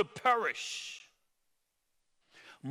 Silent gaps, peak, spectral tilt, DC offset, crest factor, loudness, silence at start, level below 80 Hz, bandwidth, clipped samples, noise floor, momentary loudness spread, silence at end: none; -14 dBFS; -2.5 dB/octave; under 0.1%; 24 dB; -32 LUFS; 0 s; -84 dBFS; 17 kHz; under 0.1%; -79 dBFS; 17 LU; 0 s